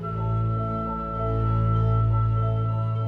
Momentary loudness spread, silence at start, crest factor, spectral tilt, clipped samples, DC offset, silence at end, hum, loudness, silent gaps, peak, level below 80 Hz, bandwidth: 6 LU; 0 s; 10 dB; -11 dB/octave; under 0.1%; under 0.1%; 0 s; none; -25 LUFS; none; -14 dBFS; -34 dBFS; 3.5 kHz